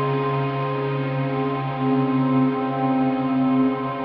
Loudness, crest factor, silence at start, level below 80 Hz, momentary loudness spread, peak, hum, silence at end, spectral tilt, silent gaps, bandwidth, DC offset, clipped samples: -22 LUFS; 12 dB; 0 s; -58 dBFS; 4 LU; -10 dBFS; none; 0 s; -11 dB/octave; none; 5.2 kHz; under 0.1%; under 0.1%